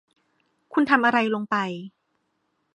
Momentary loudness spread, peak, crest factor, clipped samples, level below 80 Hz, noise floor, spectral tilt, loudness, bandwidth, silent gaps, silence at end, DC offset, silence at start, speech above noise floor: 12 LU; -2 dBFS; 22 dB; under 0.1%; -74 dBFS; -73 dBFS; -6 dB/octave; -22 LUFS; 10.5 kHz; none; 0.9 s; under 0.1%; 0.7 s; 51 dB